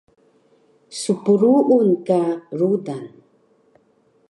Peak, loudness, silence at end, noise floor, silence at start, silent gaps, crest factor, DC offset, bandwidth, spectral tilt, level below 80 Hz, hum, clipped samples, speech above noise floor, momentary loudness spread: -4 dBFS; -18 LUFS; 1.25 s; -60 dBFS; 0.9 s; none; 16 dB; under 0.1%; 11.5 kHz; -7 dB/octave; -74 dBFS; none; under 0.1%; 42 dB; 18 LU